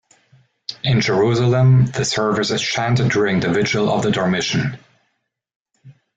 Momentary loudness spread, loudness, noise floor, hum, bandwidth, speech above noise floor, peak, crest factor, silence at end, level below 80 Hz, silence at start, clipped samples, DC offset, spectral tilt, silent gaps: 7 LU; -17 LUFS; -72 dBFS; none; 8 kHz; 56 dB; -6 dBFS; 12 dB; 0.25 s; -48 dBFS; 0.7 s; under 0.1%; under 0.1%; -5.5 dB/octave; 5.56-5.66 s